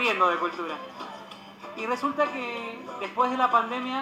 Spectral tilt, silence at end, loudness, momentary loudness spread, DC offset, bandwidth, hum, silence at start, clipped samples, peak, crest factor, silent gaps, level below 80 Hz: -4 dB/octave; 0 s; -27 LUFS; 17 LU; under 0.1%; 15 kHz; none; 0 s; under 0.1%; -8 dBFS; 20 dB; none; -78 dBFS